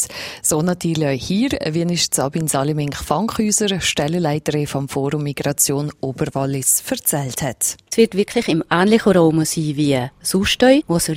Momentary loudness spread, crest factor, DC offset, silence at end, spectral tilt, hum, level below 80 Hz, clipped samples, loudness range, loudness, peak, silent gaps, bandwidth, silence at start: 8 LU; 18 dB; under 0.1%; 0 s; -4 dB/octave; none; -46 dBFS; under 0.1%; 3 LU; -18 LUFS; 0 dBFS; none; 16.5 kHz; 0 s